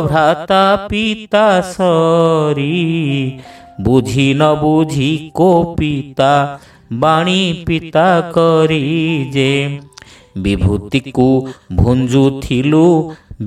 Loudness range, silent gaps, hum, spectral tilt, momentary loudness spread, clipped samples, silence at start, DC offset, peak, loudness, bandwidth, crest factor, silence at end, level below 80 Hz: 2 LU; none; none; -6.5 dB/octave; 8 LU; under 0.1%; 0 s; under 0.1%; 0 dBFS; -13 LUFS; 13.5 kHz; 14 dB; 0 s; -34 dBFS